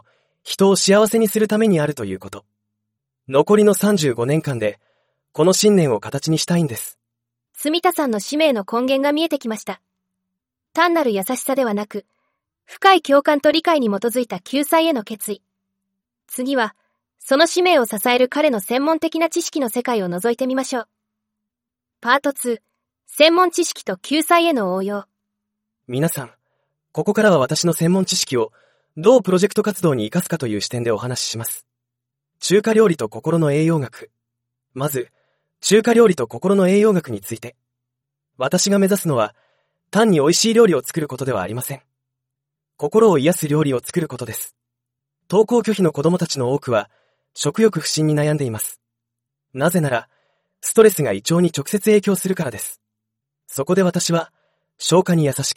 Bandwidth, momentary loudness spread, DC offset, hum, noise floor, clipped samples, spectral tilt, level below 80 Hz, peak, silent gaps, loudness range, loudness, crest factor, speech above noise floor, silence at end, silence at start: 16.5 kHz; 14 LU; under 0.1%; none; -85 dBFS; under 0.1%; -4.5 dB/octave; -64 dBFS; 0 dBFS; none; 4 LU; -18 LUFS; 18 dB; 67 dB; 0.05 s; 0.45 s